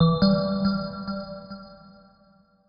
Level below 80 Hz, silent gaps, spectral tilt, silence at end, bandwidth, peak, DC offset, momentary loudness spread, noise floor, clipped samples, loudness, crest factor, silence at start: -48 dBFS; none; -7 dB/octave; 0.95 s; 5.4 kHz; -8 dBFS; under 0.1%; 21 LU; -59 dBFS; under 0.1%; -25 LUFS; 18 dB; 0 s